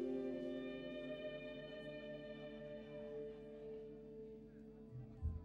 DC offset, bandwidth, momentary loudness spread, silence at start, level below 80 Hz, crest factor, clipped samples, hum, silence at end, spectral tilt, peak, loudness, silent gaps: under 0.1%; 7.8 kHz; 10 LU; 0 s; -60 dBFS; 16 dB; under 0.1%; none; 0 s; -8 dB/octave; -34 dBFS; -50 LUFS; none